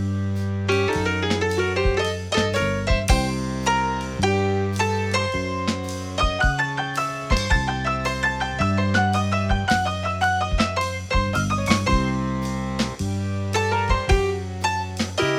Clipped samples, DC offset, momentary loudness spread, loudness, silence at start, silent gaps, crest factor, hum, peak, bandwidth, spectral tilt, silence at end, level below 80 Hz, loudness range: under 0.1%; under 0.1%; 5 LU; -23 LUFS; 0 s; none; 20 dB; none; -2 dBFS; 14.5 kHz; -5 dB/octave; 0 s; -30 dBFS; 1 LU